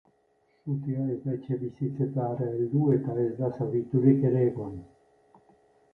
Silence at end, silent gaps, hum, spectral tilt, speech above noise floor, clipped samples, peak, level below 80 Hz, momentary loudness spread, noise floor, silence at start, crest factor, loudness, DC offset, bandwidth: 1.1 s; none; none; -12.5 dB/octave; 41 dB; under 0.1%; -10 dBFS; -62 dBFS; 11 LU; -68 dBFS; 0.65 s; 18 dB; -28 LUFS; under 0.1%; 3 kHz